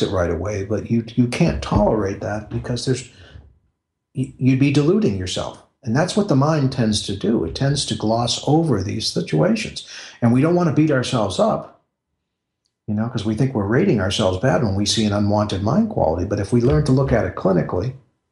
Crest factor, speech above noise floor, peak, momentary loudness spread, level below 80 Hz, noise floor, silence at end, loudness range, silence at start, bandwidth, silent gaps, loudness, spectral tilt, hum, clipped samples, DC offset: 16 dB; 59 dB; -4 dBFS; 9 LU; -40 dBFS; -78 dBFS; 0.35 s; 3 LU; 0 s; 11.5 kHz; none; -19 LUFS; -6 dB/octave; none; under 0.1%; under 0.1%